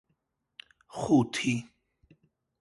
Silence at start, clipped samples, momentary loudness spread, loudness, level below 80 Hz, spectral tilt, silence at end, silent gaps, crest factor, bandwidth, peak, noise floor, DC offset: 0.95 s; under 0.1%; 13 LU; -28 LUFS; -66 dBFS; -5.5 dB/octave; 0.95 s; none; 20 dB; 11.5 kHz; -12 dBFS; -78 dBFS; under 0.1%